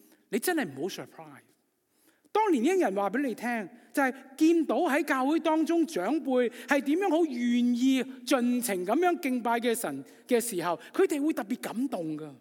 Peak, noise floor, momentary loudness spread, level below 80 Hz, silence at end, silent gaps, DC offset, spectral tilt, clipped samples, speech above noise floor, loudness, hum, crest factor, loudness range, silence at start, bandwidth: -10 dBFS; -71 dBFS; 9 LU; under -90 dBFS; 0.05 s; none; under 0.1%; -4 dB/octave; under 0.1%; 43 dB; -28 LUFS; none; 18 dB; 3 LU; 0.3 s; 17.5 kHz